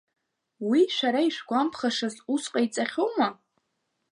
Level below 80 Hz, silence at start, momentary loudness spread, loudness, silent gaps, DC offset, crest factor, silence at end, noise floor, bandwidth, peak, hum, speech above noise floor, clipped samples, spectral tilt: -80 dBFS; 0.6 s; 6 LU; -26 LUFS; none; under 0.1%; 16 dB; 0.8 s; -78 dBFS; 11 kHz; -10 dBFS; none; 52 dB; under 0.1%; -3.5 dB/octave